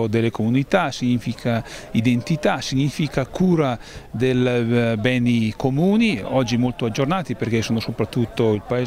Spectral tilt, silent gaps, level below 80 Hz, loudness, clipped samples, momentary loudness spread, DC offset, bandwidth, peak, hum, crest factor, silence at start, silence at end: -6.5 dB/octave; none; -46 dBFS; -21 LUFS; under 0.1%; 5 LU; under 0.1%; 15 kHz; -4 dBFS; none; 16 dB; 0 s; 0 s